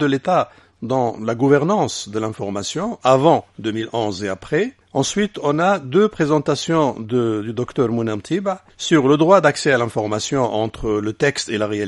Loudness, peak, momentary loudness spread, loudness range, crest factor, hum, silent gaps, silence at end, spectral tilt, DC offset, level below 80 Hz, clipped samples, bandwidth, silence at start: -19 LUFS; 0 dBFS; 10 LU; 2 LU; 18 dB; none; none; 0 s; -5.5 dB/octave; under 0.1%; -50 dBFS; under 0.1%; 11.5 kHz; 0 s